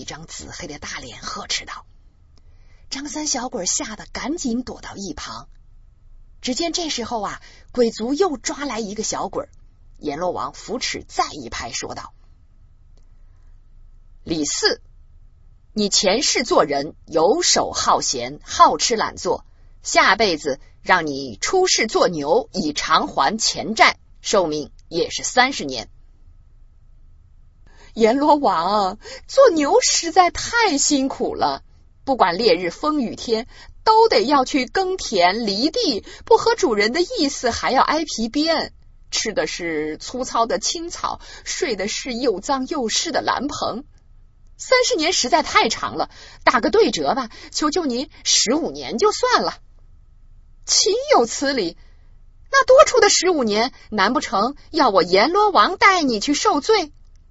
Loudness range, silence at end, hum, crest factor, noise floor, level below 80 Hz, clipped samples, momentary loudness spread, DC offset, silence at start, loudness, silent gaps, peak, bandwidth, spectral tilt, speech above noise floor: 10 LU; 0.25 s; none; 20 dB; -48 dBFS; -46 dBFS; under 0.1%; 15 LU; under 0.1%; 0 s; -19 LUFS; none; 0 dBFS; 8.2 kHz; -2 dB/octave; 29 dB